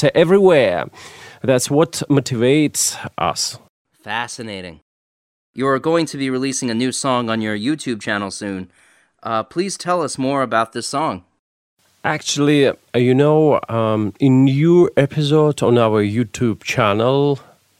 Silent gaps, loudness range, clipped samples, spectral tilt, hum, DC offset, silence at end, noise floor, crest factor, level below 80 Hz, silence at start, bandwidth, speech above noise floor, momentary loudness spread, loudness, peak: 3.69-3.85 s, 4.82-5.54 s, 11.39-11.77 s; 7 LU; under 0.1%; -5 dB/octave; none; under 0.1%; 0.4 s; under -90 dBFS; 18 dB; -56 dBFS; 0 s; 16 kHz; over 73 dB; 13 LU; -17 LUFS; 0 dBFS